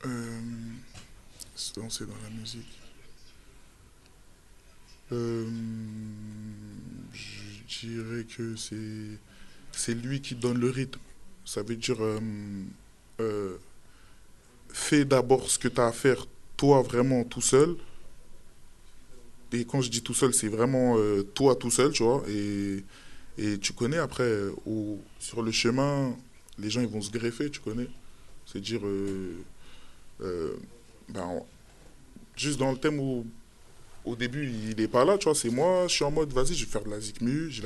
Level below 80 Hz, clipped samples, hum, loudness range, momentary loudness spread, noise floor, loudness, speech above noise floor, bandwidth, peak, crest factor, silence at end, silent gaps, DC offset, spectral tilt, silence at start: -48 dBFS; under 0.1%; none; 13 LU; 19 LU; -55 dBFS; -29 LUFS; 27 dB; 12 kHz; -8 dBFS; 22 dB; 0 s; none; under 0.1%; -4.5 dB/octave; 0 s